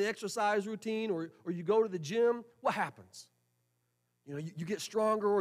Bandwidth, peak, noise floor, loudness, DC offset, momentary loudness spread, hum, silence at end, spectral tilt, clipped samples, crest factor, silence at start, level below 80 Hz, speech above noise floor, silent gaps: 15 kHz; -18 dBFS; -79 dBFS; -34 LUFS; under 0.1%; 13 LU; 60 Hz at -65 dBFS; 0 s; -5 dB/octave; under 0.1%; 16 dB; 0 s; -84 dBFS; 46 dB; none